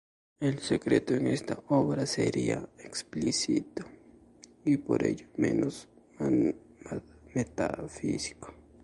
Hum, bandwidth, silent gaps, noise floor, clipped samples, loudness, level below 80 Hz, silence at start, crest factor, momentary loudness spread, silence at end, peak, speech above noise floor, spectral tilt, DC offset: none; 11.5 kHz; none; -56 dBFS; under 0.1%; -31 LUFS; -58 dBFS; 0.4 s; 20 dB; 14 LU; 0.3 s; -12 dBFS; 27 dB; -5.5 dB/octave; under 0.1%